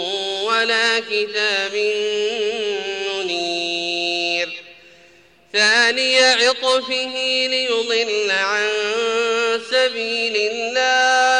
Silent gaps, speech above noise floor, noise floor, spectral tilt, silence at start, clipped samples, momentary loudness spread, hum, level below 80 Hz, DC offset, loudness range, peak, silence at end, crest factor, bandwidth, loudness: none; 33 dB; -51 dBFS; -0.5 dB/octave; 0 s; under 0.1%; 8 LU; none; -68 dBFS; under 0.1%; 5 LU; -6 dBFS; 0 s; 14 dB; 10.5 kHz; -18 LUFS